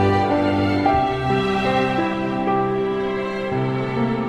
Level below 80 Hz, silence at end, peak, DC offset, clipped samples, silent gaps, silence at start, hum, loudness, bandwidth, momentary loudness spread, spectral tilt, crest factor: -42 dBFS; 0 s; -6 dBFS; under 0.1%; under 0.1%; none; 0 s; none; -20 LUFS; 10.5 kHz; 5 LU; -7.5 dB/octave; 14 dB